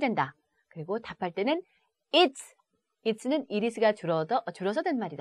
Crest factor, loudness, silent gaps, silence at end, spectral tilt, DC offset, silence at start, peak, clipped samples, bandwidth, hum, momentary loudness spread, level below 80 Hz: 20 dB; -29 LUFS; none; 0.05 s; -5 dB/octave; under 0.1%; 0 s; -10 dBFS; under 0.1%; 13 kHz; none; 11 LU; -76 dBFS